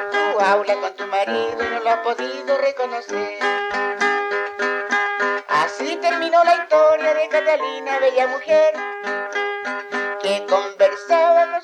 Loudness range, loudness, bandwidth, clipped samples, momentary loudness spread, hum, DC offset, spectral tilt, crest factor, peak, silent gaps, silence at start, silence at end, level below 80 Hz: 4 LU; -19 LUFS; 10.5 kHz; under 0.1%; 9 LU; none; under 0.1%; -2.5 dB/octave; 16 dB; -4 dBFS; none; 0 s; 0 s; -68 dBFS